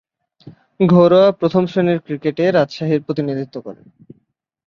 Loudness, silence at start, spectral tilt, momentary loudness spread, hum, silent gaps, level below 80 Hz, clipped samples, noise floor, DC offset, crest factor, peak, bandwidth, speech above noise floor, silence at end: -16 LUFS; 0.45 s; -8.5 dB/octave; 14 LU; none; none; -58 dBFS; under 0.1%; -64 dBFS; under 0.1%; 16 dB; -2 dBFS; 6.8 kHz; 48 dB; 0.95 s